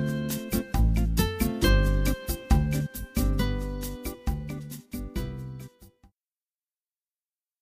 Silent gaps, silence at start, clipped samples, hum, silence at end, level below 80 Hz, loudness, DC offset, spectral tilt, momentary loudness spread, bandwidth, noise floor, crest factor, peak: none; 0 s; under 0.1%; none; 1.75 s; -30 dBFS; -28 LUFS; under 0.1%; -5.5 dB/octave; 14 LU; 15.5 kHz; under -90 dBFS; 18 dB; -10 dBFS